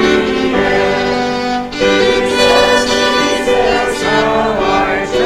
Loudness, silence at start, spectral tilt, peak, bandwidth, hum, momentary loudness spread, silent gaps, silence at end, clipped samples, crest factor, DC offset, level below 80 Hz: -12 LUFS; 0 s; -3.5 dB/octave; 0 dBFS; 15 kHz; none; 5 LU; none; 0 s; under 0.1%; 12 dB; under 0.1%; -34 dBFS